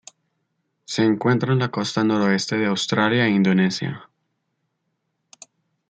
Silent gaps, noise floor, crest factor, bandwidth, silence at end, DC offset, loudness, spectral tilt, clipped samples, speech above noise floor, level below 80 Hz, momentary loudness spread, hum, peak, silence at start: none; -75 dBFS; 18 dB; 9 kHz; 1.85 s; under 0.1%; -20 LUFS; -5.5 dB/octave; under 0.1%; 55 dB; -66 dBFS; 9 LU; none; -4 dBFS; 0.9 s